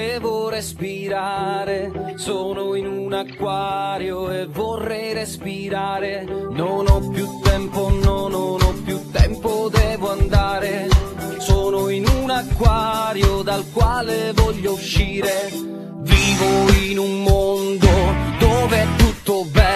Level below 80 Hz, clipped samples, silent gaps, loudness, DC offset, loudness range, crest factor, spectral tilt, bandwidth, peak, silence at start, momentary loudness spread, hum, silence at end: -24 dBFS; under 0.1%; none; -20 LUFS; under 0.1%; 7 LU; 18 dB; -5.5 dB/octave; 14 kHz; 0 dBFS; 0 s; 10 LU; none; 0 s